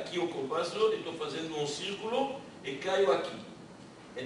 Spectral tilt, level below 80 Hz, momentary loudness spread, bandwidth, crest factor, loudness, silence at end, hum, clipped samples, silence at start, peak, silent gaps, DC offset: -4 dB/octave; -72 dBFS; 17 LU; 11.5 kHz; 20 dB; -33 LUFS; 0 s; none; under 0.1%; 0 s; -14 dBFS; none; under 0.1%